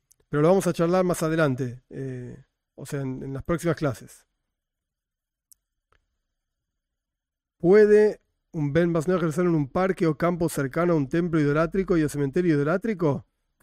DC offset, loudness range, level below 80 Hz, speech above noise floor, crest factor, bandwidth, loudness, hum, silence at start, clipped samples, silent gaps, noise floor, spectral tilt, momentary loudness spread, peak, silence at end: under 0.1%; 10 LU; -52 dBFS; 64 dB; 16 dB; 16 kHz; -23 LUFS; none; 0.3 s; under 0.1%; none; -87 dBFS; -7 dB/octave; 15 LU; -8 dBFS; 0.4 s